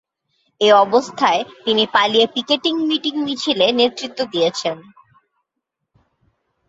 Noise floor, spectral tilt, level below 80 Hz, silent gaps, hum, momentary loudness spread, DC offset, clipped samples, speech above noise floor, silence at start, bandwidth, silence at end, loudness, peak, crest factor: -79 dBFS; -3.5 dB/octave; -66 dBFS; none; none; 9 LU; under 0.1%; under 0.1%; 61 dB; 0.6 s; 8 kHz; 1.9 s; -17 LUFS; -2 dBFS; 18 dB